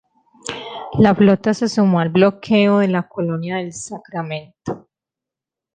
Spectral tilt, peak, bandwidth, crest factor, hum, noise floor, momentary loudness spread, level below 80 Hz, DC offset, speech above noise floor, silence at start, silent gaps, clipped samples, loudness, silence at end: -6.5 dB/octave; -2 dBFS; 9.4 kHz; 16 dB; none; -87 dBFS; 16 LU; -54 dBFS; under 0.1%; 70 dB; 0.45 s; none; under 0.1%; -17 LUFS; 0.95 s